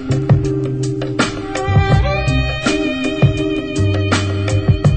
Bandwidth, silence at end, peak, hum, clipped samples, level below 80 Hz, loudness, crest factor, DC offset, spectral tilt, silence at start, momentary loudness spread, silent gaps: 9 kHz; 0 s; -2 dBFS; none; under 0.1%; -26 dBFS; -16 LUFS; 14 dB; under 0.1%; -6 dB/octave; 0 s; 5 LU; none